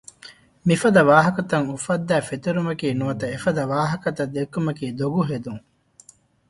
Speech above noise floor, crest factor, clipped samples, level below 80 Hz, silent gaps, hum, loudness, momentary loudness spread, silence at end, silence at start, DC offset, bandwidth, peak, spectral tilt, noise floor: 31 dB; 22 dB; under 0.1%; -56 dBFS; none; none; -22 LUFS; 11 LU; 0.9 s; 0.25 s; under 0.1%; 11.5 kHz; 0 dBFS; -6 dB/octave; -52 dBFS